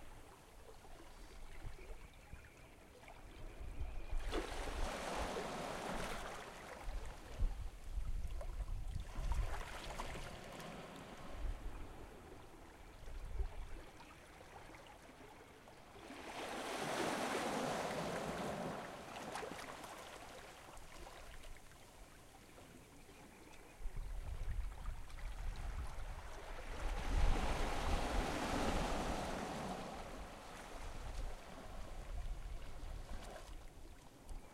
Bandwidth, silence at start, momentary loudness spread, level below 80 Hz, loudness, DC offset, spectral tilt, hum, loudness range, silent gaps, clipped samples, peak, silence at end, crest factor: 15.5 kHz; 0 s; 19 LU; -46 dBFS; -46 LUFS; under 0.1%; -4.5 dB/octave; none; 13 LU; none; under 0.1%; -22 dBFS; 0 s; 22 dB